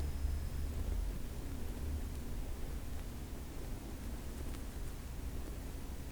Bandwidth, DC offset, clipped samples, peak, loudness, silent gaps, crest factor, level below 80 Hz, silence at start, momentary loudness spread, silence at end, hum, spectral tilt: over 20 kHz; under 0.1%; under 0.1%; -26 dBFS; -45 LUFS; none; 14 dB; -42 dBFS; 0 s; 6 LU; 0 s; none; -6 dB/octave